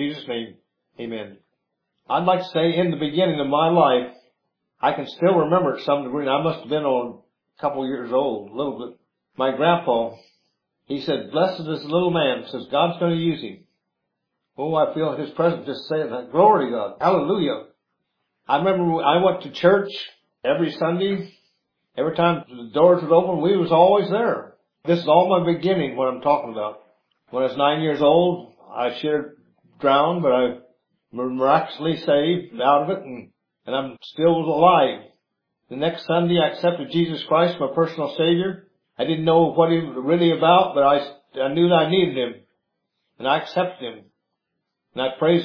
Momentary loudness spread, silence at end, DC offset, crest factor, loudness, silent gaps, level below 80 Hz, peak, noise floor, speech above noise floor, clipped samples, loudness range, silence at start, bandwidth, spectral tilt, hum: 14 LU; 0 s; under 0.1%; 20 dB; -21 LUFS; none; -68 dBFS; -2 dBFS; -79 dBFS; 59 dB; under 0.1%; 5 LU; 0 s; 5.4 kHz; -8.5 dB/octave; none